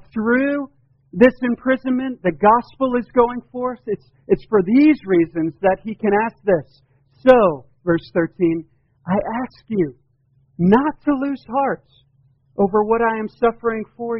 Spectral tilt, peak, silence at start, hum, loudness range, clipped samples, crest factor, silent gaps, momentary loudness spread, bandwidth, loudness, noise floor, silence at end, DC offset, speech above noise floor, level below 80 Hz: -6.5 dB/octave; 0 dBFS; 0.15 s; none; 4 LU; under 0.1%; 18 dB; none; 12 LU; 5.8 kHz; -19 LUFS; -60 dBFS; 0 s; under 0.1%; 42 dB; -50 dBFS